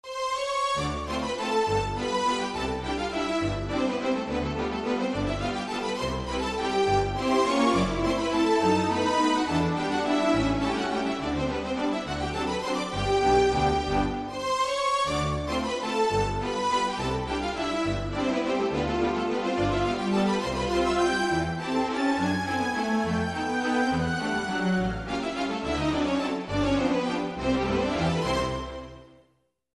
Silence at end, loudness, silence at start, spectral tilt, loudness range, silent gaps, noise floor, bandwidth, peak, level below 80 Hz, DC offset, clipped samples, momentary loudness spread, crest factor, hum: 0.7 s; -27 LUFS; 0.05 s; -5 dB/octave; 3 LU; none; -69 dBFS; 12 kHz; -10 dBFS; -42 dBFS; under 0.1%; under 0.1%; 6 LU; 16 dB; none